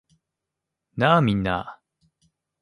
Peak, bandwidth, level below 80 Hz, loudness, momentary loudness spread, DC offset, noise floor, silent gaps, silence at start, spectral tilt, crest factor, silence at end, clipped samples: -4 dBFS; 11.5 kHz; -50 dBFS; -21 LUFS; 20 LU; under 0.1%; -84 dBFS; none; 0.95 s; -7.5 dB/octave; 22 dB; 0.9 s; under 0.1%